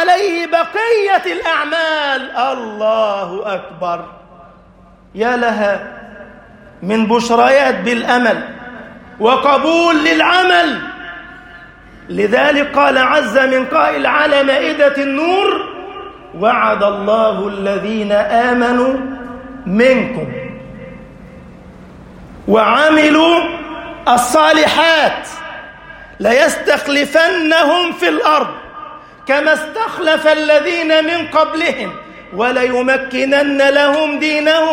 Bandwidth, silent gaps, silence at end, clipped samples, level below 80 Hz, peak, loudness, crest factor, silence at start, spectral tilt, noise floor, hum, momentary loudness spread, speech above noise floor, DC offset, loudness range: 16.5 kHz; none; 0 s; under 0.1%; -48 dBFS; 0 dBFS; -13 LUFS; 14 dB; 0 s; -4 dB/octave; -43 dBFS; none; 18 LU; 31 dB; under 0.1%; 6 LU